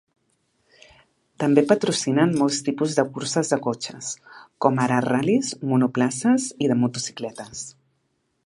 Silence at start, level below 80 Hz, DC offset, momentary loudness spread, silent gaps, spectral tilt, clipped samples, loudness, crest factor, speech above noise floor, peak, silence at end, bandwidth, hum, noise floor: 1.4 s; -66 dBFS; under 0.1%; 13 LU; none; -5 dB/octave; under 0.1%; -22 LUFS; 22 dB; 49 dB; -2 dBFS; 0.75 s; 11.5 kHz; none; -71 dBFS